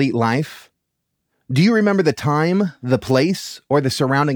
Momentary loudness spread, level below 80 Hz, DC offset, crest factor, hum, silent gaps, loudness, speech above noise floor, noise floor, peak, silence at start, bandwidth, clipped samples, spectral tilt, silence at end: 7 LU; -58 dBFS; under 0.1%; 16 dB; none; none; -18 LUFS; 58 dB; -75 dBFS; -2 dBFS; 0 s; over 20 kHz; under 0.1%; -6.5 dB/octave; 0 s